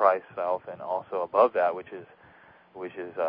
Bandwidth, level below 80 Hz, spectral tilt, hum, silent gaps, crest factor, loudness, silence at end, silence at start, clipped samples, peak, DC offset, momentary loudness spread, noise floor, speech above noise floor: 5.2 kHz; -74 dBFS; -9 dB/octave; none; none; 22 dB; -28 LUFS; 0 s; 0 s; under 0.1%; -6 dBFS; under 0.1%; 18 LU; -55 dBFS; 27 dB